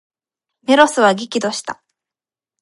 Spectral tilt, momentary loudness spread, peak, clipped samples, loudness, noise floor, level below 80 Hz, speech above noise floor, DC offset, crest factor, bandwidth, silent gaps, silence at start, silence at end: -3.5 dB/octave; 18 LU; 0 dBFS; under 0.1%; -15 LUFS; under -90 dBFS; -64 dBFS; over 75 dB; under 0.1%; 18 dB; 11.5 kHz; none; 0.7 s; 0.9 s